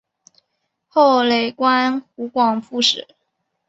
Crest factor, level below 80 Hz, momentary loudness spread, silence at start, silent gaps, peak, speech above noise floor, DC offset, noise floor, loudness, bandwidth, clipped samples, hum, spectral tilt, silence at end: 18 dB; -68 dBFS; 11 LU; 0.95 s; none; -2 dBFS; 56 dB; under 0.1%; -74 dBFS; -17 LUFS; 8 kHz; under 0.1%; none; -3 dB/octave; 0.7 s